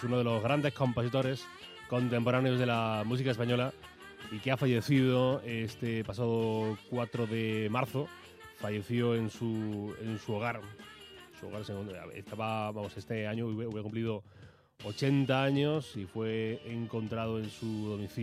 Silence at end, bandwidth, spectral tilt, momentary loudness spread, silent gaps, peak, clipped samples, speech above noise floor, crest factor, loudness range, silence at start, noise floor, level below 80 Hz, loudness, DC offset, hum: 0 s; 14.5 kHz; -7 dB/octave; 15 LU; none; -14 dBFS; under 0.1%; 20 dB; 20 dB; 7 LU; 0 s; -52 dBFS; -68 dBFS; -33 LUFS; under 0.1%; none